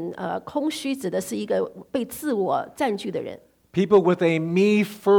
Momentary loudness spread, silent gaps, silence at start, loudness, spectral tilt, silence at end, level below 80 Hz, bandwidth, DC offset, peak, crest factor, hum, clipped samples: 11 LU; none; 0 s; -24 LUFS; -6 dB/octave; 0 s; -64 dBFS; 19 kHz; under 0.1%; -8 dBFS; 16 dB; none; under 0.1%